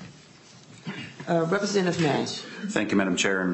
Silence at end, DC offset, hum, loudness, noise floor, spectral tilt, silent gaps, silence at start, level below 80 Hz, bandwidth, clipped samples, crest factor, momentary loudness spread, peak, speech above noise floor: 0 s; under 0.1%; none; -25 LUFS; -51 dBFS; -4.5 dB/octave; none; 0 s; -68 dBFS; 8.6 kHz; under 0.1%; 20 dB; 14 LU; -8 dBFS; 26 dB